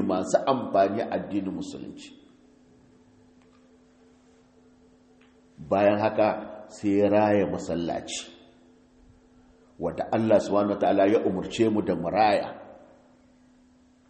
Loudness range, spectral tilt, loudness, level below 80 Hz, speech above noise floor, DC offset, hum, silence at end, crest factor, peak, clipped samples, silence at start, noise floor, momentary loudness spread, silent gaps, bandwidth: 8 LU; -6 dB/octave; -25 LUFS; -62 dBFS; 34 dB; under 0.1%; none; 1.3 s; 20 dB; -8 dBFS; under 0.1%; 0 s; -59 dBFS; 16 LU; none; 8.4 kHz